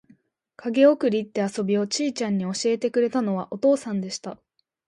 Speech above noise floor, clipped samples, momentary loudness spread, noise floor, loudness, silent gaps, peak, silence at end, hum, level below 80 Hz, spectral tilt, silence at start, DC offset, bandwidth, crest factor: 36 dB; under 0.1%; 11 LU; -59 dBFS; -23 LUFS; none; -6 dBFS; 0.5 s; none; -72 dBFS; -5 dB/octave; 0.6 s; under 0.1%; 11.5 kHz; 18 dB